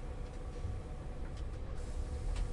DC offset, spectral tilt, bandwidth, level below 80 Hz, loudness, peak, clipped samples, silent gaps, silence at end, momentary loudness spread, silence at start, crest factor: under 0.1%; -6.5 dB/octave; 11 kHz; -40 dBFS; -44 LUFS; -26 dBFS; under 0.1%; none; 0 s; 5 LU; 0 s; 12 dB